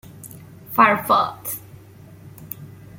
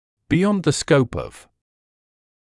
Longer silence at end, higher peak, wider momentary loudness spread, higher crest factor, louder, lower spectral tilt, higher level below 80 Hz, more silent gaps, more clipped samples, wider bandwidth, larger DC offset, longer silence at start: second, 0 s vs 1.1 s; about the same, -2 dBFS vs -4 dBFS; first, 24 LU vs 12 LU; about the same, 22 dB vs 18 dB; about the same, -19 LUFS vs -19 LUFS; second, -4 dB/octave vs -5.5 dB/octave; second, -58 dBFS vs -48 dBFS; neither; neither; first, 17 kHz vs 12 kHz; neither; about the same, 0.2 s vs 0.3 s